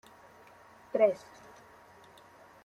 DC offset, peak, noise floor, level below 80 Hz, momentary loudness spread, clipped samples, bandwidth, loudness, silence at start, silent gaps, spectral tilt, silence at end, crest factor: under 0.1%; -14 dBFS; -57 dBFS; -78 dBFS; 26 LU; under 0.1%; 12.5 kHz; -30 LUFS; 0.95 s; none; -5.5 dB/octave; 1.45 s; 22 dB